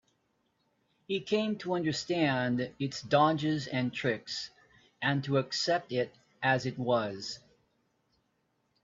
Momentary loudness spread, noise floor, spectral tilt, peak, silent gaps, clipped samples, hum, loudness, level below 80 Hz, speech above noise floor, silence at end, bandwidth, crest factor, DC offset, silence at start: 10 LU; -76 dBFS; -5.5 dB/octave; -12 dBFS; none; under 0.1%; none; -31 LUFS; -70 dBFS; 46 dB; 1.45 s; 7.8 kHz; 22 dB; under 0.1%; 1.1 s